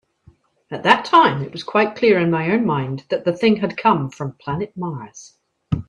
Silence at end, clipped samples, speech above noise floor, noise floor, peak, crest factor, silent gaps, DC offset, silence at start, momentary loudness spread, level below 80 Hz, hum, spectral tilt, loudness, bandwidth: 0.05 s; under 0.1%; 35 dB; -54 dBFS; 0 dBFS; 20 dB; none; under 0.1%; 0.7 s; 14 LU; -52 dBFS; none; -6.5 dB/octave; -19 LUFS; 9.8 kHz